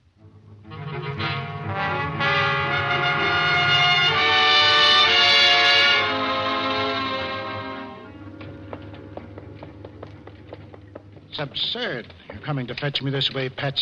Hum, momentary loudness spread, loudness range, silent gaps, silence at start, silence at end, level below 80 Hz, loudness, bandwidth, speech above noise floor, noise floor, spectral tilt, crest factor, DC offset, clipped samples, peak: none; 25 LU; 18 LU; none; 0.25 s; 0 s; -54 dBFS; -19 LUFS; 11.5 kHz; 23 dB; -49 dBFS; -3.5 dB/octave; 16 dB; under 0.1%; under 0.1%; -6 dBFS